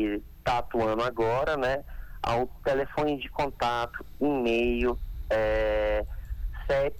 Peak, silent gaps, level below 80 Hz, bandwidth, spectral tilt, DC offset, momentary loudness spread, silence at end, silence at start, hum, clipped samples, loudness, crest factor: -16 dBFS; none; -38 dBFS; 19 kHz; -6.5 dB/octave; under 0.1%; 10 LU; 0 s; 0 s; none; under 0.1%; -28 LUFS; 12 dB